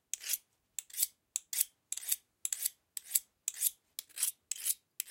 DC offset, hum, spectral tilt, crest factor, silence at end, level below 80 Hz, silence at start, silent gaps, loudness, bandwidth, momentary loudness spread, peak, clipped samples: under 0.1%; none; 5 dB/octave; 30 dB; 0 s; -88 dBFS; 0.15 s; none; -36 LUFS; 17 kHz; 10 LU; -8 dBFS; under 0.1%